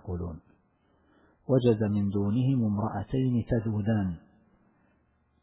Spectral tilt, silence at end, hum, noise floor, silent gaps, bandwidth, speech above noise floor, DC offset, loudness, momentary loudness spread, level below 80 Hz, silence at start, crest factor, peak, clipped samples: -12.5 dB/octave; 1.25 s; none; -69 dBFS; none; 4 kHz; 42 dB; under 0.1%; -28 LUFS; 14 LU; -50 dBFS; 0.05 s; 18 dB; -12 dBFS; under 0.1%